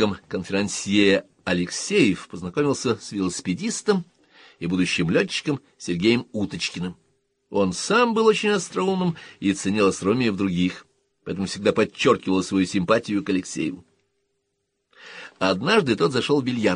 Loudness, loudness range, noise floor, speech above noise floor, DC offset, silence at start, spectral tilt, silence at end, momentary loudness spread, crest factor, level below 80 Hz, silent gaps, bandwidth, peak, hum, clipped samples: -23 LUFS; 3 LU; -76 dBFS; 53 dB; under 0.1%; 0 s; -5 dB/octave; 0 s; 11 LU; 18 dB; -58 dBFS; none; 10.5 kHz; -6 dBFS; none; under 0.1%